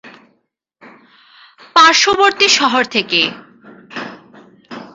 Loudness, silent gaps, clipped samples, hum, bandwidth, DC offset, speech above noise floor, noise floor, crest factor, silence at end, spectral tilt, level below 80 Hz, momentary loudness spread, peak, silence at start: -11 LUFS; none; under 0.1%; none; 8 kHz; under 0.1%; 52 dB; -65 dBFS; 16 dB; 0.1 s; -1 dB/octave; -58 dBFS; 23 LU; 0 dBFS; 0.05 s